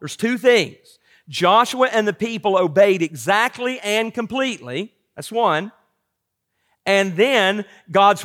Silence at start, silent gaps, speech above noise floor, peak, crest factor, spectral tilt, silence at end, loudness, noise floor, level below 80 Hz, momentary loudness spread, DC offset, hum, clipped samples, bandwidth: 0 s; none; 59 dB; -4 dBFS; 16 dB; -4 dB/octave; 0 s; -18 LUFS; -77 dBFS; -68 dBFS; 13 LU; under 0.1%; none; under 0.1%; 16.5 kHz